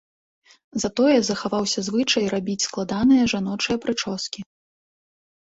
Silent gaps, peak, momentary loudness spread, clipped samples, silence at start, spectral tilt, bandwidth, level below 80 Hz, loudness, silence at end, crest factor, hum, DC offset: none; -6 dBFS; 10 LU; under 0.1%; 0.75 s; -4 dB/octave; 8 kHz; -54 dBFS; -22 LUFS; 1.15 s; 18 dB; none; under 0.1%